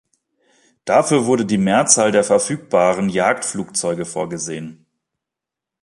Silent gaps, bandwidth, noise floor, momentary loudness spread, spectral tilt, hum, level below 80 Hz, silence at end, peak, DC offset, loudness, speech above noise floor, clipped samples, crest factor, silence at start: none; 11.5 kHz; -85 dBFS; 13 LU; -4 dB/octave; none; -58 dBFS; 1.1 s; 0 dBFS; under 0.1%; -17 LUFS; 68 dB; under 0.1%; 18 dB; 0.85 s